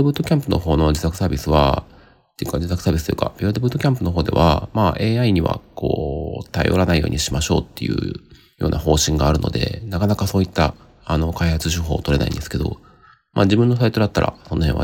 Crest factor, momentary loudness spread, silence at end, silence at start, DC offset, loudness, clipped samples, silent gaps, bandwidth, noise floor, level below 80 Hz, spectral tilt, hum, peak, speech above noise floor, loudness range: 18 dB; 8 LU; 0 s; 0 s; under 0.1%; -20 LUFS; under 0.1%; none; 17 kHz; -49 dBFS; -32 dBFS; -6 dB/octave; none; -2 dBFS; 31 dB; 2 LU